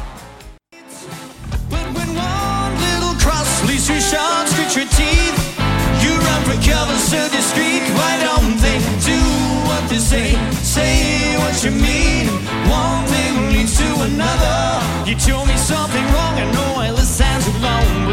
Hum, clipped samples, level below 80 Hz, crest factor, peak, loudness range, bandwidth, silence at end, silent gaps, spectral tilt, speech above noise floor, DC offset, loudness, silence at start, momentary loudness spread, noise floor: none; under 0.1%; -20 dBFS; 14 dB; 0 dBFS; 2 LU; 16.5 kHz; 0 s; none; -4 dB/octave; 24 dB; under 0.1%; -16 LUFS; 0 s; 4 LU; -39 dBFS